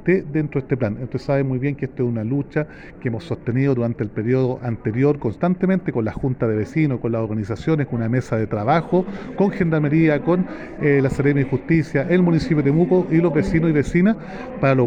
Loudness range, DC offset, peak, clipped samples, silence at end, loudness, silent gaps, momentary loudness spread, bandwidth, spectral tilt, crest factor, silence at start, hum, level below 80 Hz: 5 LU; under 0.1%; -6 dBFS; under 0.1%; 0 s; -20 LUFS; none; 8 LU; 9.2 kHz; -9 dB/octave; 12 dB; 0 s; none; -42 dBFS